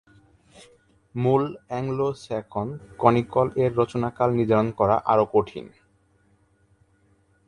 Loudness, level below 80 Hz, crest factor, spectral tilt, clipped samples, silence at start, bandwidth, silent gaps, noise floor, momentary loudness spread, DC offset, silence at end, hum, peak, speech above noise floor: -23 LUFS; -54 dBFS; 22 dB; -8.5 dB/octave; under 0.1%; 1.15 s; 11 kHz; none; -63 dBFS; 11 LU; under 0.1%; 1.8 s; none; -2 dBFS; 40 dB